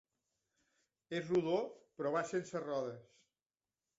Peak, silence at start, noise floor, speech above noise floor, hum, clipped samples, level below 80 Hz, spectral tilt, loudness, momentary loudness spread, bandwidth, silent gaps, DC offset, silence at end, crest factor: -22 dBFS; 1.1 s; under -90 dBFS; over 52 dB; none; under 0.1%; -80 dBFS; -5 dB/octave; -39 LUFS; 11 LU; 7.6 kHz; none; under 0.1%; 0.95 s; 18 dB